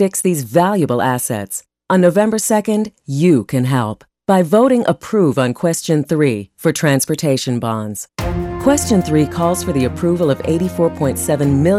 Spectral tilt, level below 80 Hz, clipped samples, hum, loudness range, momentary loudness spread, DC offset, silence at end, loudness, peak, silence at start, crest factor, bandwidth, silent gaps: -5.5 dB/octave; -40 dBFS; under 0.1%; none; 2 LU; 9 LU; under 0.1%; 0 s; -16 LUFS; -2 dBFS; 0 s; 14 dB; 16 kHz; none